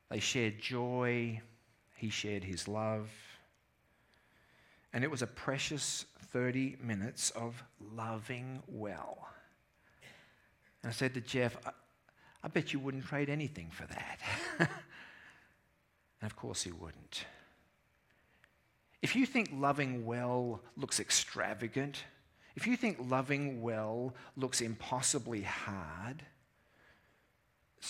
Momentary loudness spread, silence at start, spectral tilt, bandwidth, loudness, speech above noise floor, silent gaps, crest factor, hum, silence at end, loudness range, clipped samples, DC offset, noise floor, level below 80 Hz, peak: 15 LU; 0.1 s; -4 dB/octave; 16.5 kHz; -37 LUFS; 37 dB; none; 28 dB; none; 0 s; 8 LU; under 0.1%; under 0.1%; -74 dBFS; -72 dBFS; -12 dBFS